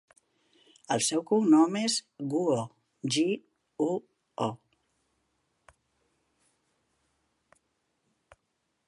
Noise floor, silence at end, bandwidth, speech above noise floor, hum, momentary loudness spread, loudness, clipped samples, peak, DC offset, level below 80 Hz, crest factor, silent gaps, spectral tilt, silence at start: -79 dBFS; 4.3 s; 11.5 kHz; 52 dB; none; 15 LU; -28 LUFS; under 0.1%; -12 dBFS; under 0.1%; -78 dBFS; 20 dB; none; -4 dB/octave; 0.9 s